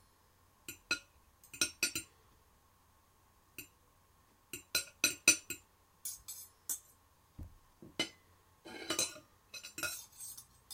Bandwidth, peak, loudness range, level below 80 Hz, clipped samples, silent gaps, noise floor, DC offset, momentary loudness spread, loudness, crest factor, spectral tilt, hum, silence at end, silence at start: 16.5 kHz; -10 dBFS; 9 LU; -68 dBFS; under 0.1%; none; -69 dBFS; under 0.1%; 23 LU; -37 LUFS; 32 dB; 0 dB/octave; none; 0 s; 0.7 s